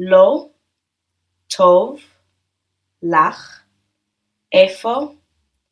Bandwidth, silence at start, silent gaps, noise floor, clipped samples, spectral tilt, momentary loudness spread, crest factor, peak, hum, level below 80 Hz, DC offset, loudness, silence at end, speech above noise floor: 11 kHz; 0 s; none; -76 dBFS; under 0.1%; -4.5 dB/octave; 16 LU; 18 dB; 0 dBFS; none; -68 dBFS; under 0.1%; -15 LUFS; 0.6 s; 62 dB